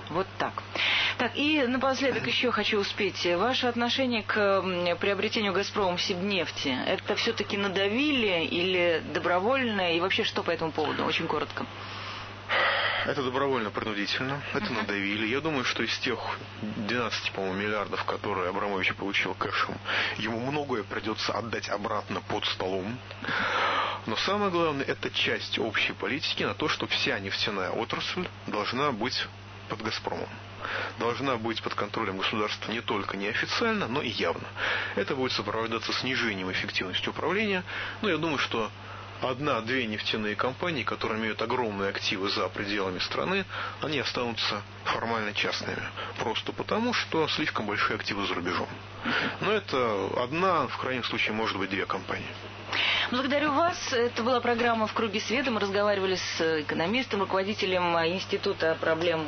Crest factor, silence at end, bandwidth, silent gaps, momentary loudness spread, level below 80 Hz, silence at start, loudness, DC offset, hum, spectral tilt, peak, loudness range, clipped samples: 18 dB; 0 s; 6.6 kHz; none; 6 LU; -58 dBFS; 0 s; -28 LUFS; under 0.1%; none; -4.5 dB/octave; -12 dBFS; 4 LU; under 0.1%